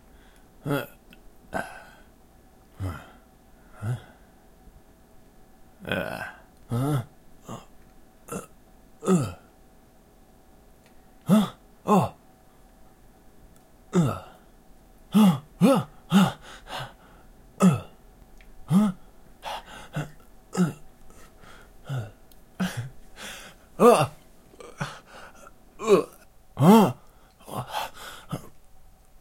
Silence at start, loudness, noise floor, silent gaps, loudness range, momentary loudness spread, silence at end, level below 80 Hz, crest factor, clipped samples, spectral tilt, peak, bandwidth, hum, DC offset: 0.65 s; -25 LUFS; -54 dBFS; none; 13 LU; 23 LU; 0.7 s; -54 dBFS; 24 dB; under 0.1%; -6.5 dB/octave; -4 dBFS; 16.5 kHz; none; under 0.1%